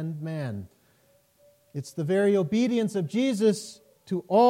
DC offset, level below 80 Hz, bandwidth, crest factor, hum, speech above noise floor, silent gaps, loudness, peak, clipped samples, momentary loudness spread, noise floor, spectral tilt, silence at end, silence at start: under 0.1%; -72 dBFS; 16 kHz; 16 dB; none; 39 dB; none; -26 LUFS; -10 dBFS; under 0.1%; 15 LU; -64 dBFS; -6.5 dB/octave; 0 s; 0 s